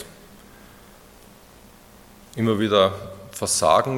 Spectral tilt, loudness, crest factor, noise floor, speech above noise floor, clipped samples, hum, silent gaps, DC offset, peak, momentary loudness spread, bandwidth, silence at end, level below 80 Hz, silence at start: -4 dB/octave; -20 LUFS; 22 dB; -49 dBFS; 29 dB; under 0.1%; none; none; under 0.1%; -4 dBFS; 20 LU; 17.5 kHz; 0 s; -56 dBFS; 0 s